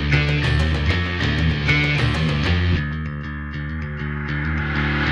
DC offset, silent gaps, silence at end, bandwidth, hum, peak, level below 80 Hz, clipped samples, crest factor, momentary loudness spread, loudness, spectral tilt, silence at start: under 0.1%; none; 0 s; 9.8 kHz; none; -4 dBFS; -28 dBFS; under 0.1%; 16 dB; 10 LU; -21 LUFS; -6.5 dB/octave; 0 s